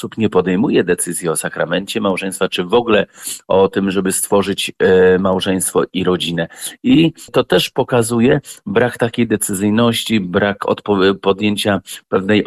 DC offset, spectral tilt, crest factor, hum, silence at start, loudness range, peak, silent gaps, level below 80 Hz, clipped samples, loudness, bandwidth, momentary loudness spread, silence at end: under 0.1%; -4.5 dB/octave; 12 dB; none; 0 s; 2 LU; -2 dBFS; none; -50 dBFS; under 0.1%; -16 LUFS; 15.5 kHz; 6 LU; 0 s